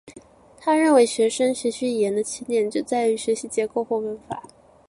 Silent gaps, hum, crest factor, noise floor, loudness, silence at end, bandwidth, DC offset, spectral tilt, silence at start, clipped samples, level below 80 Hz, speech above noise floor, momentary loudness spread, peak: none; none; 18 dB; -48 dBFS; -22 LUFS; 0.45 s; 11.5 kHz; under 0.1%; -3.5 dB/octave; 0.05 s; under 0.1%; -64 dBFS; 27 dB; 12 LU; -6 dBFS